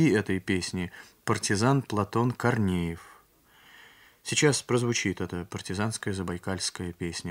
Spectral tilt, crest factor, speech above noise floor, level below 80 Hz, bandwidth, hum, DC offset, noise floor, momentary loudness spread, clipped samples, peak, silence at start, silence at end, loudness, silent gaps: -4.5 dB/octave; 20 dB; 32 dB; -58 dBFS; 16 kHz; none; under 0.1%; -59 dBFS; 11 LU; under 0.1%; -8 dBFS; 0 s; 0 s; -28 LUFS; none